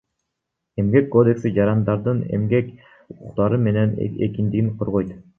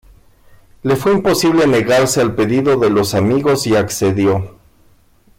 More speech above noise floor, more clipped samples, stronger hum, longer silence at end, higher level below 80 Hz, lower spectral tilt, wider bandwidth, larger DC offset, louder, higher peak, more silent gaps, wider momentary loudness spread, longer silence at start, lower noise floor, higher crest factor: first, 60 dB vs 37 dB; neither; neither; second, 0.2 s vs 0.9 s; about the same, -48 dBFS vs -44 dBFS; first, -10.5 dB/octave vs -5 dB/octave; second, 6.4 kHz vs 16.5 kHz; neither; second, -20 LUFS vs -14 LUFS; about the same, -2 dBFS vs -4 dBFS; neither; first, 8 LU vs 4 LU; about the same, 0.75 s vs 0.85 s; first, -80 dBFS vs -50 dBFS; first, 18 dB vs 10 dB